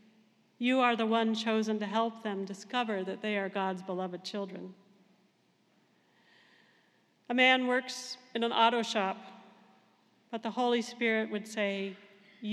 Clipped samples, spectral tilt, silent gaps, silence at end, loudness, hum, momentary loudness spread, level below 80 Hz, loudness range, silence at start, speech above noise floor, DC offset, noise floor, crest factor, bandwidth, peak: under 0.1%; -4 dB/octave; none; 0 s; -31 LUFS; none; 14 LU; under -90 dBFS; 10 LU; 0.6 s; 39 dB; under 0.1%; -70 dBFS; 22 dB; 12.5 kHz; -12 dBFS